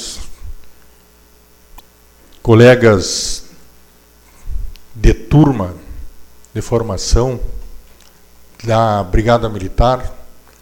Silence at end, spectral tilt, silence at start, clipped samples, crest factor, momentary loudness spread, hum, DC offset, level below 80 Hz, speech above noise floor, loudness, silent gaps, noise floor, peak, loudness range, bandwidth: 0.3 s; -5.5 dB/octave; 0 s; under 0.1%; 16 dB; 23 LU; none; under 0.1%; -24 dBFS; 35 dB; -14 LUFS; none; -47 dBFS; 0 dBFS; 5 LU; 18 kHz